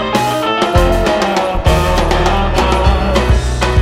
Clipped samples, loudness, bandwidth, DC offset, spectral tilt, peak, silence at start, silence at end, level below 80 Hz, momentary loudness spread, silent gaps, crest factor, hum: under 0.1%; -13 LUFS; 16 kHz; under 0.1%; -5.5 dB/octave; 0 dBFS; 0 s; 0 s; -16 dBFS; 2 LU; none; 12 dB; none